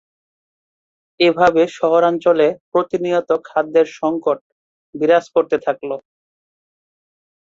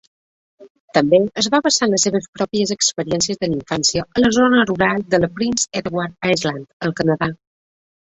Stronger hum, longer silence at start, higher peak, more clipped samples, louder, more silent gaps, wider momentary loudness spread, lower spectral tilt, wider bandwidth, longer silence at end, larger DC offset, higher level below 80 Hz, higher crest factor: neither; first, 1.2 s vs 0.6 s; about the same, -2 dBFS vs -2 dBFS; neither; about the same, -17 LUFS vs -18 LUFS; first, 2.60-2.72 s, 4.41-4.93 s vs 0.70-0.88 s, 2.28-2.33 s, 6.73-6.80 s; about the same, 9 LU vs 8 LU; first, -5.5 dB/octave vs -3.5 dB/octave; second, 7.6 kHz vs 8.4 kHz; first, 1.6 s vs 0.65 s; neither; second, -60 dBFS vs -50 dBFS; about the same, 16 dB vs 18 dB